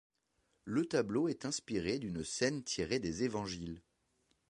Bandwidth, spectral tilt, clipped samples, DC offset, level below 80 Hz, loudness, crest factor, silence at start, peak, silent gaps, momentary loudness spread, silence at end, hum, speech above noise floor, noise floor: 11 kHz; -4.5 dB/octave; under 0.1%; under 0.1%; -62 dBFS; -37 LUFS; 20 dB; 0.65 s; -18 dBFS; none; 9 LU; 0.7 s; none; 43 dB; -79 dBFS